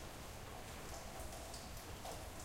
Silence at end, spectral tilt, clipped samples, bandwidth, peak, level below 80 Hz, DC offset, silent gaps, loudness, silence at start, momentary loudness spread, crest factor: 0 s; -3.5 dB/octave; under 0.1%; 16.5 kHz; -36 dBFS; -56 dBFS; under 0.1%; none; -50 LUFS; 0 s; 2 LU; 14 dB